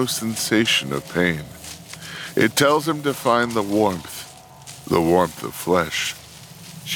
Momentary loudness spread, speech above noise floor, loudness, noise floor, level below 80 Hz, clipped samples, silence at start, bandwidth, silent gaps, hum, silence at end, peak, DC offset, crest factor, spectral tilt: 20 LU; 21 dB; -20 LUFS; -41 dBFS; -52 dBFS; under 0.1%; 0 s; 19.5 kHz; none; none; 0 s; -2 dBFS; under 0.1%; 20 dB; -4 dB/octave